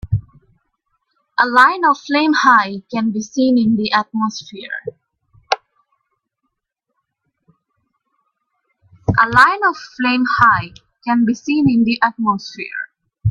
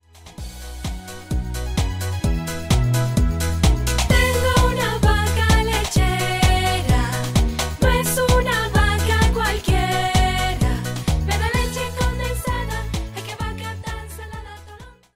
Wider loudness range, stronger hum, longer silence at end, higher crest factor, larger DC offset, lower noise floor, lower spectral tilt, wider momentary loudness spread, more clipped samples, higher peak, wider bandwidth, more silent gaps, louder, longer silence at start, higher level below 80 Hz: first, 15 LU vs 6 LU; neither; second, 0 s vs 0.25 s; about the same, 18 dB vs 16 dB; neither; first, -76 dBFS vs -42 dBFS; about the same, -5.5 dB/octave vs -4.5 dB/octave; first, 16 LU vs 13 LU; neither; first, 0 dBFS vs -4 dBFS; second, 10.5 kHz vs 16 kHz; neither; first, -15 LUFS vs -20 LUFS; second, 0.05 s vs 0.25 s; second, -46 dBFS vs -24 dBFS